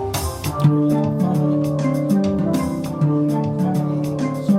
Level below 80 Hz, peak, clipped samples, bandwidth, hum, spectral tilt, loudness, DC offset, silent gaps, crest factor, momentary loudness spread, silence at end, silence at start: -44 dBFS; -4 dBFS; under 0.1%; 16 kHz; none; -7.5 dB/octave; -20 LUFS; under 0.1%; none; 14 dB; 5 LU; 0 s; 0 s